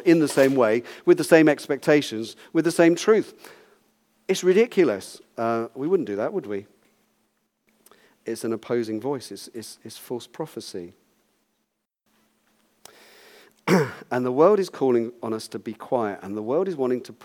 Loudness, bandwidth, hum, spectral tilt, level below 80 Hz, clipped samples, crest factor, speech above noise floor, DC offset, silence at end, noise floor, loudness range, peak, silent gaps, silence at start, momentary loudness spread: -23 LUFS; 16.5 kHz; none; -5.5 dB/octave; -78 dBFS; under 0.1%; 22 dB; 55 dB; under 0.1%; 0.1 s; -77 dBFS; 17 LU; -2 dBFS; none; 0 s; 18 LU